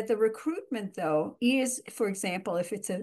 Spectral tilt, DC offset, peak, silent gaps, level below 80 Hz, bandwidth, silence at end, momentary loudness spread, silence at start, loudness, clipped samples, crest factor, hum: -4 dB/octave; under 0.1%; -14 dBFS; none; -80 dBFS; 12.5 kHz; 0 s; 7 LU; 0 s; -30 LUFS; under 0.1%; 16 dB; none